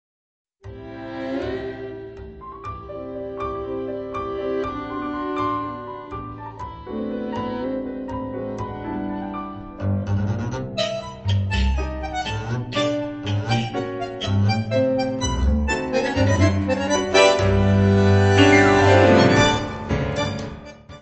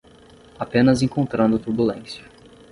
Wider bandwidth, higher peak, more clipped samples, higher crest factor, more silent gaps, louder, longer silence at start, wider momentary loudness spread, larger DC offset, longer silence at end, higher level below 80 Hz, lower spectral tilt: second, 8.4 kHz vs 11.5 kHz; about the same, -2 dBFS vs -4 dBFS; neither; about the same, 20 dB vs 18 dB; neither; about the same, -21 LUFS vs -20 LUFS; about the same, 0.65 s vs 0.6 s; about the same, 19 LU vs 17 LU; neither; second, 0 s vs 0.5 s; first, -34 dBFS vs -50 dBFS; about the same, -6 dB/octave vs -7 dB/octave